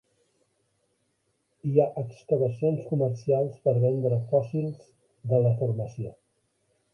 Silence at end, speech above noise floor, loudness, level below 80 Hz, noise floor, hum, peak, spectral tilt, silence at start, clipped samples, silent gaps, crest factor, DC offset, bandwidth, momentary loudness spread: 0.8 s; 48 dB; -27 LUFS; -64 dBFS; -74 dBFS; none; -8 dBFS; -10.5 dB/octave; 1.65 s; under 0.1%; none; 20 dB; under 0.1%; 6.6 kHz; 12 LU